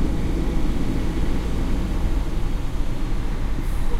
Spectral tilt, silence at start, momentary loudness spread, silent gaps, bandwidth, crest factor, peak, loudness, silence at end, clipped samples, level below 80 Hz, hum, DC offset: -7 dB/octave; 0 s; 3 LU; none; 12.5 kHz; 12 dB; -8 dBFS; -27 LUFS; 0 s; under 0.1%; -22 dBFS; none; under 0.1%